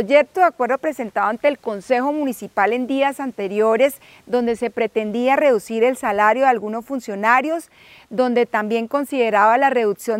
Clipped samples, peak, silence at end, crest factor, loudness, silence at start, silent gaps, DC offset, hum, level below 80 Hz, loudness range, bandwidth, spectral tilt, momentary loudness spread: under 0.1%; -2 dBFS; 0 s; 18 dB; -19 LUFS; 0 s; none; under 0.1%; none; -64 dBFS; 2 LU; 16 kHz; -4.5 dB/octave; 9 LU